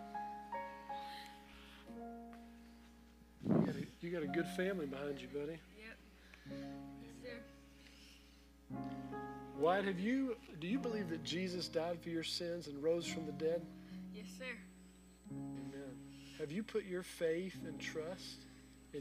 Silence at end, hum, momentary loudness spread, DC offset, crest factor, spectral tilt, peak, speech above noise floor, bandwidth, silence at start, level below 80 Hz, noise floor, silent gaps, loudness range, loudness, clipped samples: 0 s; 60 Hz at -65 dBFS; 21 LU; under 0.1%; 22 dB; -5.5 dB/octave; -22 dBFS; 23 dB; 15.5 kHz; 0 s; -68 dBFS; -63 dBFS; none; 11 LU; -43 LUFS; under 0.1%